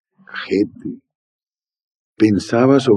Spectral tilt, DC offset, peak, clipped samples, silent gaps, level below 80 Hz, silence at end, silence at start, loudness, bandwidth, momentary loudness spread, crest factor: -7 dB/octave; under 0.1%; 0 dBFS; under 0.1%; 1.15-1.39 s, 1.84-1.88 s, 1.95-2.13 s; -64 dBFS; 0 s; 0.35 s; -17 LUFS; 11 kHz; 18 LU; 18 dB